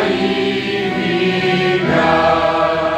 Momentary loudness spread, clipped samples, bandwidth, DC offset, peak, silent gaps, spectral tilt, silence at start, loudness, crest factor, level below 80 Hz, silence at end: 5 LU; under 0.1%; 9.2 kHz; under 0.1%; -2 dBFS; none; -6 dB/octave; 0 s; -15 LUFS; 14 dB; -44 dBFS; 0 s